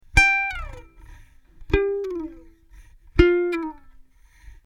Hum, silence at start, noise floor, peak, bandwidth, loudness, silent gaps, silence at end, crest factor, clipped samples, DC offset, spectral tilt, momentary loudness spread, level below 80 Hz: none; 0.15 s; -50 dBFS; 0 dBFS; 12.5 kHz; -21 LUFS; none; 0.15 s; 24 dB; under 0.1%; under 0.1%; -5.5 dB/octave; 18 LU; -32 dBFS